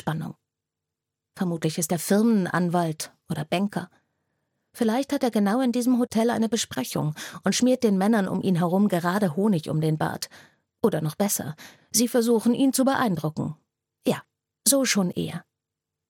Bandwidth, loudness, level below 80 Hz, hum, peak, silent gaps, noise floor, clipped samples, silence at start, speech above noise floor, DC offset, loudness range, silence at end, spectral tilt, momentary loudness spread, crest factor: 17.5 kHz; -24 LUFS; -68 dBFS; none; -4 dBFS; none; -86 dBFS; under 0.1%; 0.05 s; 62 dB; under 0.1%; 3 LU; 0.7 s; -5 dB/octave; 12 LU; 20 dB